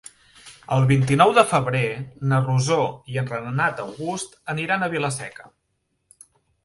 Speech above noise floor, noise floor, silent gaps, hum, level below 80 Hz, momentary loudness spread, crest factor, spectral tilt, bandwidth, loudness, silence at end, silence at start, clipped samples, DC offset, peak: 52 dB; -73 dBFS; none; none; -56 dBFS; 13 LU; 22 dB; -5.5 dB/octave; 11.5 kHz; -22 LUFS; 1.15 s; 0.45 s; under 0.1%; under 0.1%; 0 dBFS